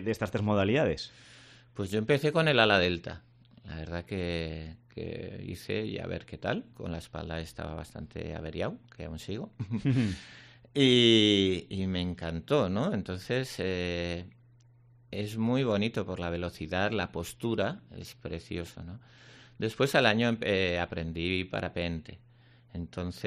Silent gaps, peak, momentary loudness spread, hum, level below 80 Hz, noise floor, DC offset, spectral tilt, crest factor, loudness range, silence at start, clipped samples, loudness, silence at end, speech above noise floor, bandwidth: none; -8 dBFS; 18 LU; none; -56 dBFS; -59 dBFS; under 0.1%; -5.5 dB/octave; 24 dB; 11 LU; 0 s; under 0.1%; -30 LUFS; 0 s; 29 dB; 14 kHz